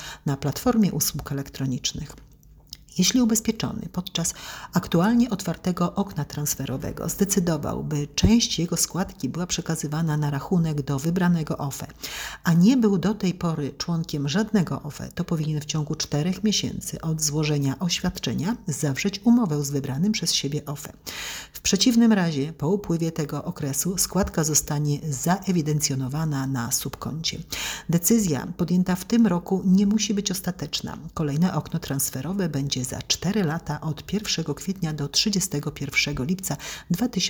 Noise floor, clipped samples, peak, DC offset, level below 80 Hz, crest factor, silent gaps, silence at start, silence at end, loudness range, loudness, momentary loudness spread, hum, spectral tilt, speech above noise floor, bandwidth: -46 dBFS; under 0.1%; -6 dBFS; under 0.1%; -46 dBFS; 18 dB; none; 0 s; 0 s; 3 LU; -24 LUFS; 10 LU; none; -4.5 dB/octave; 22 dB; over 20 kHz